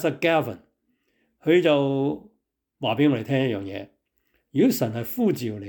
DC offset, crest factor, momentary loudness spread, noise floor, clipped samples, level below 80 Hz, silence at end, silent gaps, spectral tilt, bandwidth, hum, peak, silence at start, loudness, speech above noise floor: under 0.1%; 16 dB; 14 LU; -73 dBFS; under 0.1%; -68 dBFS; 0 s; none; -6.5 dB/octave; 19.5 kHz; none; -8 dBFS; 0 s; -23 LUFS; 50 dB